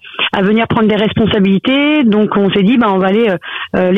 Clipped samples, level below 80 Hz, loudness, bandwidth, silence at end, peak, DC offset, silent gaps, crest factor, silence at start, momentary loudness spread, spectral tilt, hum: under 0.1%; -44 dBFS; -12 LUFS; 4.6 kHz; 0 s; -4 dBFS; 0.2%; none; 8 dB; 0.05 s; 5 LU; -8.5 dB/octave; none